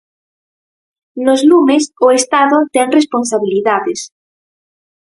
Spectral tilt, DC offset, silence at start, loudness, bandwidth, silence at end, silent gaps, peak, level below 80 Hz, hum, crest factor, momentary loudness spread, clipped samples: -3 dB/octave; under 0.1%; 1.15 s; -12 LUFS; 11.5 kHz; 1.05 s; none; 0 dBFS; -62 dBFS; none; 14 dB; 11 LU; under 0.1%